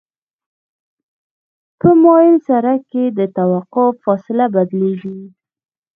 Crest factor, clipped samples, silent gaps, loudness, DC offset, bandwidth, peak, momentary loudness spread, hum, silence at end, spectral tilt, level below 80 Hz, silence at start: 16 dB; under 0.1%; none; -14 LUFS; under 0.1%; 3.6 kHz; 0 dBFS; 11 LU; none; 0.7 s; -11.5 dB/octave; -58 dBFS; 1.85 s